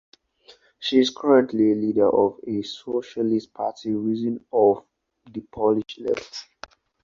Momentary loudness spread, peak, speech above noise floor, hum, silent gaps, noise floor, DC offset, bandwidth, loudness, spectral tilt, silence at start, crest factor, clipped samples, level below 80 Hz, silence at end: 14 LU; -4 dBFS; 33 dB; none; none; -55 dBFS; under 0.1%; 7.4 kHz; -23 LUFS; -6 dB/octave; 0.8 s; 18 dB; under 0.1%; -62 dBFS; 0.6 s